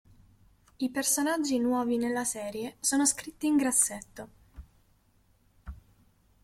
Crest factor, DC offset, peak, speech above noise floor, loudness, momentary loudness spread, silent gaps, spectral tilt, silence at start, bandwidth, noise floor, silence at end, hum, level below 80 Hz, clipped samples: 20 dB; under 0.1%; -10 dBFS; 37 dB; -28 LUFS; 23 LU; none; -2 dB/octave; 0.8 s; 16 kHz; -66 dBFS; 0.65 s; none; -58 dBFS; under 0.1%